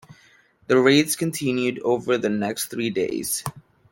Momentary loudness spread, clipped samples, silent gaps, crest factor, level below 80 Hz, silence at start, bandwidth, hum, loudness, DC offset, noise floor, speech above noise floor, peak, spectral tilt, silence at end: 9 LU; under 0.1%; none; 20 dB; -62 dBFS; 0.1 s; 17 kHz; none; -22 LUFS; under 0.1%; -56 dBFS; 35 dB; -4 dBFS; -4 dB/octave; 0.35 s